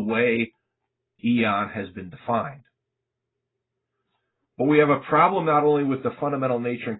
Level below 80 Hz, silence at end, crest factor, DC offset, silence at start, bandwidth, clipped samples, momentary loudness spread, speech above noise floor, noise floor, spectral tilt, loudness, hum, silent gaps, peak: -62 dBFS; 0 s; 20 dB; under 0.1%; 0 s; 4.1 kHz; under 0.1%; 12 LU; 60 dB; -82 dBFS; -11 dB/octave; -22 LUFS; none; none; -4 dBFS